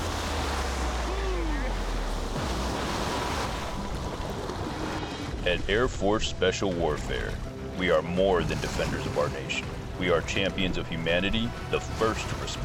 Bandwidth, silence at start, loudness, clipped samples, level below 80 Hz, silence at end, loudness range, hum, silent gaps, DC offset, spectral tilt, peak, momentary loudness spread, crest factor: 18 kHz; 0 s; -29 LUFS; under 0.1%; -36 dBFS; 0 s; 4 LU; none; none; under 0.1%; -4.5 dB/octave; -12 dBFS; 8 LU; 16 dB